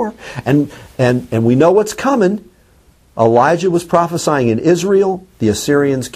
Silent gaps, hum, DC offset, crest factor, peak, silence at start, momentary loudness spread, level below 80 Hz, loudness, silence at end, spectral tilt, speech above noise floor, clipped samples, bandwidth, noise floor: none; none; under 0.1%; 14 dB; 0 dBFS; 0 s; 7 LU; -48 dBFS; -14 LUFS; 0.05 s; -6 dB/octave; 36 dB; under 0.1%; 15.5 kHz; -49 dBFS